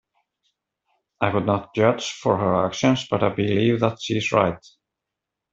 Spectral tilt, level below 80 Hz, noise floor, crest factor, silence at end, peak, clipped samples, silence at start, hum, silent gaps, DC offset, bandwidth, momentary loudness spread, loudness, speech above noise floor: -6 dB/octave; -58 dBFS; -84 dBFS; 20 dB; 0.95 s; -4 dBFS; under 0.1%; 1.2 s; none; none; under 0.1%; 7.8 kHz; 5 LU; -22 LUFS; 63 dB